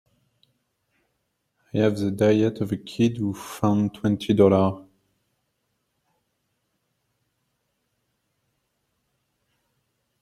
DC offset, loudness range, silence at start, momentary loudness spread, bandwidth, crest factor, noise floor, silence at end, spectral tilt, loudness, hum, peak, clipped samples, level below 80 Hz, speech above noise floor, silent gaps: under 0.1%; 4 LU; 1.75 s; 11 LU; 14.5 kHz; 24 dB; -75 dBFS; 5.4 s; -7.5 dB/octave; -23 LUFS; none; -4 dBFS; under 0.1%; -62 dBFS; 54 dB; none